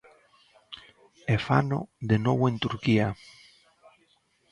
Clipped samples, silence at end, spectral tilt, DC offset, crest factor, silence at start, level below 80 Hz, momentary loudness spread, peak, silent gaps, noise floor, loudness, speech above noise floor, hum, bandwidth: under 0.1%; 1.4 s; -7.5 dB/octave; under 0.1%; 20 dB; 0.7 s; -56 dBFS; 21 LU; -8 dBFS; none; -67 dBFS; -26 LUFS; 42 dB; none; 10.5 kHz